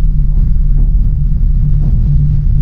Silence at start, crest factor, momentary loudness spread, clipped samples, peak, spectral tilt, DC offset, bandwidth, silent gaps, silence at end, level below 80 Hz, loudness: 0 s; 8 dB; 3 LU; under 0.1%; 0 dBFS; -12 dB/octave; under 0.1%; 0.9 kHz; none; 0 s; -10 dBFS; -14 LUFS